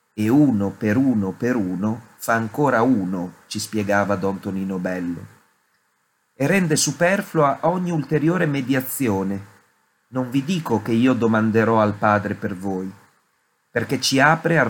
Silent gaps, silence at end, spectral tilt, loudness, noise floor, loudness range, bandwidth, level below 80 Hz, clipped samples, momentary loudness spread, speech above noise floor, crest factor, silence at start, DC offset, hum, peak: none; 0 s; -5.5 dB/octave; -21 LUFS; -68 dBFS; 3 LU; 17.5 kHz; -64 dBFS; under 0.1%; 11 LU; 48 dB; 20 dB; 0.15 s; under 0.1%; none; -2 dBFS